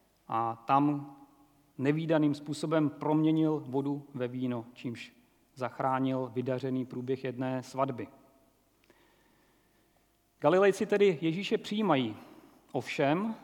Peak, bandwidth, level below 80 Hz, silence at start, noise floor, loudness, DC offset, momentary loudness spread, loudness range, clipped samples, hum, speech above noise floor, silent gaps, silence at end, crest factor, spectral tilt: -10 dBFS; 14 kHz; -78 dBFS; 0.3 s; -70 dBFS; -31 LUFS; under 0.1%; 13 LU; 7 LU; under 0.1%; none; 40 dB; none; 0.05 s; 20 dB; -7 dB/octave